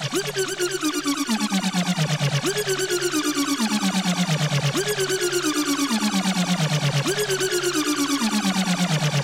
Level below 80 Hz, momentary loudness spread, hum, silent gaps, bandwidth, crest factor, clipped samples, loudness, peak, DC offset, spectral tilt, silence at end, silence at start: -60 dBFS; 2 LU; none; none; 16 kHz; 10 dB; under 0.1%; -22 LUFS; -12 dBFS; under 0.1%; -4 dB/octave; 0 s; 0 s